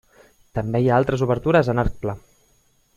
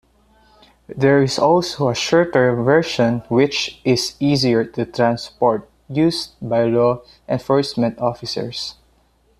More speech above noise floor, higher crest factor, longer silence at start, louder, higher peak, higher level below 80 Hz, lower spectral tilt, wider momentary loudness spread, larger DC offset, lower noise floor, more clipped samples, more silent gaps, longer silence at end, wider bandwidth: about the same, 41 dB vs 40 dB; about the same, 20 dB vs 16 dB; second, 0.55 s vs 0.9 s; second, -21 LUFS vs -18 LUFS; about the same, -2 dBFS vs -2 dBFS; first, -38 dBFS vs -52 dBFS; first, -8 dB/octave vs -5.5 dB/octave; about the same, 12 LU vs 10 LU; neither; about the same, -61 dBFS vs -58 dBFS; neither; neither; first, 0.8 s vs 0.65 s; second, 11.5 kHz vs 14 kHz